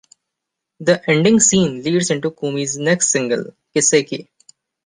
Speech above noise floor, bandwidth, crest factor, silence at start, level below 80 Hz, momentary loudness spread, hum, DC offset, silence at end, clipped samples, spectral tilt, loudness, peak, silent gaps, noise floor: 64 dB; 10 kHz; 18 dB; 0.8 s; -56 dBFS; 11 LU; none; under 0.1%; 0.6 s; under 0.1%; -3.5 dB/octave; -16 LUFS; 0 dBFS; none; -81 dBFS